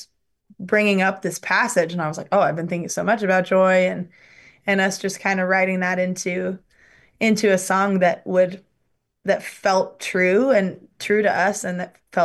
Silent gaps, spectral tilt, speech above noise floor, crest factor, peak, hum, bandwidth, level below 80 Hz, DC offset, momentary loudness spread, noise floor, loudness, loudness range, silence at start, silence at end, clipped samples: none; -5 dB/octave; 51 dB; 14 dB; -6 dBFS; none; 12.5 kHz; -68 dBFS; under 0.1%; 11 LU; -71 dBFS; -20 LUFS; 2 LU; 0 s; 0 s; under 0.1%